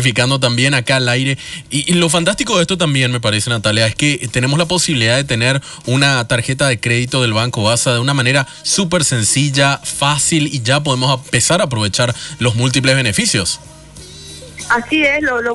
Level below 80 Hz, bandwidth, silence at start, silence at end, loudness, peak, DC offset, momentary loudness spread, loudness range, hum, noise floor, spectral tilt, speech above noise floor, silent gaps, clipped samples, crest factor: -44 dBFS; 12.5 kHz; 0 s; 0 s; -14 LUFS; -2 dBFS; under 0.1%; 5 LU; 1 LU; none; -36 dBFS; -3.5 dB/octave; 21 dB; none; under 0.1%; 12 dB